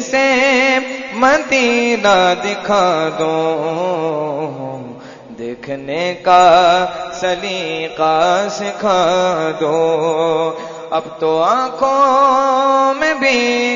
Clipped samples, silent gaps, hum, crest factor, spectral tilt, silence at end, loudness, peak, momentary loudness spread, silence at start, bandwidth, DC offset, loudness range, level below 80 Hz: under 0.1%; none; none; 14 dB; -3.5 dB/octave; 0 s; -14 LUFS; 0 dBFS; 12 LU; 0 s; 7.6 kHz; under 0.1%; 4 LU; -52 dBFS